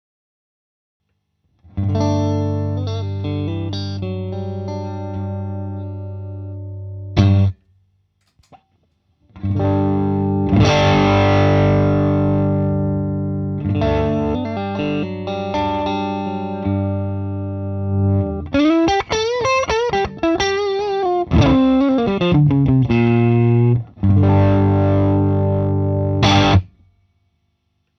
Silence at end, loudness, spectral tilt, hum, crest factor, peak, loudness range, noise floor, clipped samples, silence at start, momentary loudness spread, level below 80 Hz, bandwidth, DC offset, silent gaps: 1.3 s; -18 LUFS; -7.5 dB/octave; 50 Hz at -40 dBFS; 18 dB; 0 dBFS; 8 LU; -68 dBFS; under 0.1%; 1.75 s; 12 LU; -36 dBFS; 6.4 kHz; under 0.1%; none